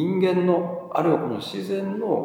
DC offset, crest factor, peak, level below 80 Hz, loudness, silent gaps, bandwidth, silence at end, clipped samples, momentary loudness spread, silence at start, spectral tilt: under 0.1%; 16 dB; -6 dBFS; -74 dBFS; -24 LUFS; none; 16.5 kHz; 0 s; under 0.1%; 8 LU; 0 s; -7.5 dB/octave